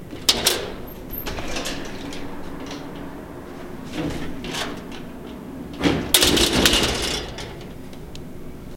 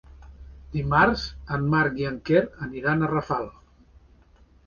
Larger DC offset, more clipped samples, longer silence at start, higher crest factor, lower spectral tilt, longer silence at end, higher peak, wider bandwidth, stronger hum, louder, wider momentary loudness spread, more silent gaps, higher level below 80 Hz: neither; neither; about the same, 0 s vs 0.1 s; about the same, 24 dB vs 22 dB; second, -2.5 dB/octave vs -7.5 dB/octave; second, 0 s vs 1.15 s; first, 0 dBFS vs -4 dBFS; first, 17 kHz vs 7 kHz; neither; first, -21 LUFS vs -24 LUFS; first, 21 LU vs 11 LU; neither; first, -38 dBFS vs -44 dBFS